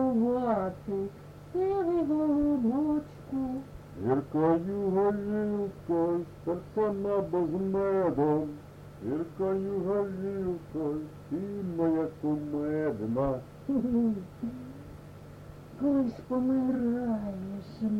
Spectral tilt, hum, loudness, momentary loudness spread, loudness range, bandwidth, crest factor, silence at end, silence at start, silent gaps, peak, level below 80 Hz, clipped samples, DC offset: -9.5 dB/octave; none; -30 LUFS; 12 LU; 3 LU; 13 kHz; 16 dB; 0 s; 0 s; none; -14 dBFS; -56 dBFS; under 0.1%; under 0.1%